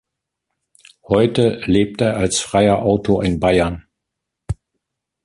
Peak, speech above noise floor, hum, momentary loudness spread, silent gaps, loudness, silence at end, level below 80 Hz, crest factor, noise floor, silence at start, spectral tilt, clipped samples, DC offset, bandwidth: -2 dBFS; 64 dB; none; 15 LU; none; -17 LUFS; 0.7 s; -38 dBFS; 16 dB; -80 dBFS; 1.1 s; -5.5 dB/octave; under 0.1%; under 0.1%; 11.5 kHz